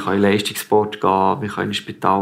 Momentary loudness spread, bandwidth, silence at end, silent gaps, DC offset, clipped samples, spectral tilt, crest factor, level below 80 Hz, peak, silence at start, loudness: 6 LU; 16 kHz; 0 s; none; under 0.1%; under 0.1%; -5 dB/octave; 16 dB; -62 dBFS; -2 dBFS; 0 s; -19 LUFS